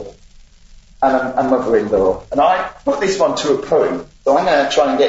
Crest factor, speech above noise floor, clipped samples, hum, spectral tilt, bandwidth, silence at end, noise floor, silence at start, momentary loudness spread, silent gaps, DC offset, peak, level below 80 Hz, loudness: 14 dB; 28 dB; under 0.1%; none; -4.5 dB/octave; 8 kHz; 0 s; -43 dBFS; 0 s; 5 LU; none; under 0.1%; -2 dBFS; -44 dBFS; -16 LUFS